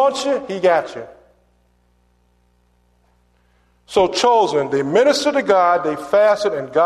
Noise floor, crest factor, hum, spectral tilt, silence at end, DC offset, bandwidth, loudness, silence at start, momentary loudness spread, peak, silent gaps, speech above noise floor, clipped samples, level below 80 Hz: -59 dBFS; 16 dB; 60 Hz at -55 dBFS; -4 dB/octave; 0 s; under 0.1%; 13 kHz; -16 LUFS; 0 s; 7 LU; -2 dBFS; none; 43 dB; under 0.1%; -56 dBFS